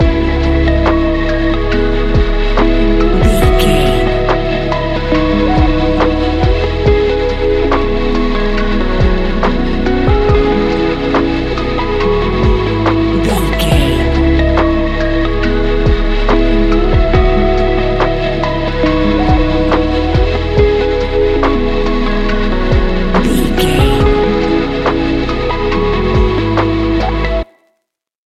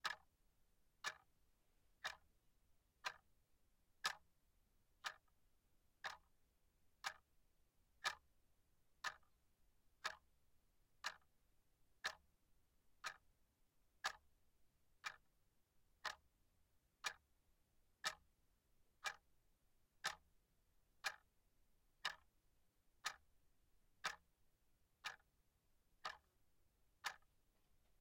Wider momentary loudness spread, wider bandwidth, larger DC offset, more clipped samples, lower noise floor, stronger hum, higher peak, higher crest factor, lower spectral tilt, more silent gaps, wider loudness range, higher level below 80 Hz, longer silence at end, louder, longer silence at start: second, 4 LU vs 16 LU; second, 13.5 kHz vs 16 kHz; first, 0.3% vs under 0.1%; neither; second, -70 dBFS vs -81 dBFS; neither; first, 0 dBFS vs -26 dBFS; second, 12 dB vs 30 dB; first, -7 dB/octave vs 1 dB/octave; neither; about the same, 1 LU vs 3 LU; first, -16 dBFS vs -82 dBFS; about the same, 0.9 s vs 0.85 s; first, -13 LUFS vs -52 LUFS; about the same, 0 s vs 0.05 s